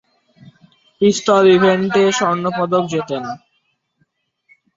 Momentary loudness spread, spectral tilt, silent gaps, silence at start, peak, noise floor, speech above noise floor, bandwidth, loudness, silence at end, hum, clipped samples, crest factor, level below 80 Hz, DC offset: 14 LU; -5 dB/octave; none; 1 s; -2 dBFS; -66 dBFS; 52 dB; 7.8 kHz; -15 LUFS; 1.4 s; none; under 0.1%; 16 dB; -60 dBFS; under 0.1%